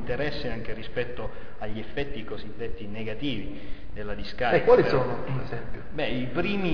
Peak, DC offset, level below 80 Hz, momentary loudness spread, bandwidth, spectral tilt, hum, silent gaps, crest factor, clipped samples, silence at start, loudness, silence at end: -6 dBFS; 4%; -42 dBFS; 18 LU; 5.4 kHz; -7.5 dB/octave; none; none; 20 dB; under 0.1%; 0 s; -28 LUFS; 0 s